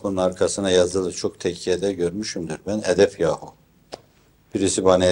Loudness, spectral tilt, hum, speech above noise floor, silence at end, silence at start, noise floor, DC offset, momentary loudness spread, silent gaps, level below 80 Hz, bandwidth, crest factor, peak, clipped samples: -22 LUFS; -4.5 dB/octave; none; 36 dB; 0 s; 0.05 s; -57 dBFS; under 0.1%; 13 LU; none; -56 dBFS; 16.5 kHz; 20 dB; -2 dBFS; under 0.1%